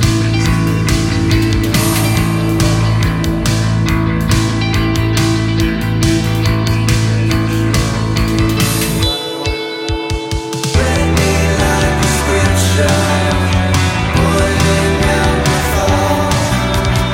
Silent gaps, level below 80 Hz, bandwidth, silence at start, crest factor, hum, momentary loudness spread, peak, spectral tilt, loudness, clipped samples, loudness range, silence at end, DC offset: none; -22 dBFS; 17 kHz; 0 s; 12 dB; none; 3 LU; 0 dBFS; -5 dB/octave; -13 LUFS; under 0.1%; 2 LU; 0 s; under 0.1%